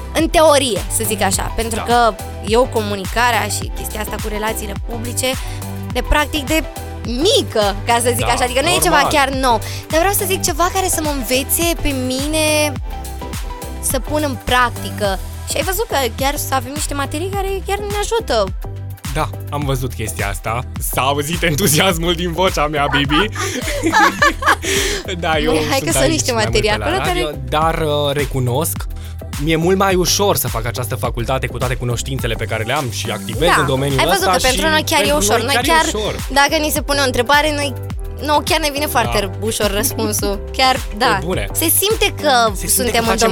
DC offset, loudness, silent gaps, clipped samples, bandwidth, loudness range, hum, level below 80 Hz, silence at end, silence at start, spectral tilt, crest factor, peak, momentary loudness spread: under 0.1%; -16 LUFS; none; under 0.1%; over 20 kHz; 5 LU; none; -28 dBFS; 0 s; 0 s; -3.5 dB/octave; 16 dB; -2 dBFS; 9 LU